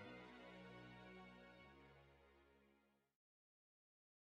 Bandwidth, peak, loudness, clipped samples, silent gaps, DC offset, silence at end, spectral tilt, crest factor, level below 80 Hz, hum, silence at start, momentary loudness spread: 9 kHz; -46 dBFS; -62 LUFS; under 0.1%; none; under 0.1%; 1.2 s; -6 dB/octave; 18 dB; -80 dBFS; none; 0 s; 8 LU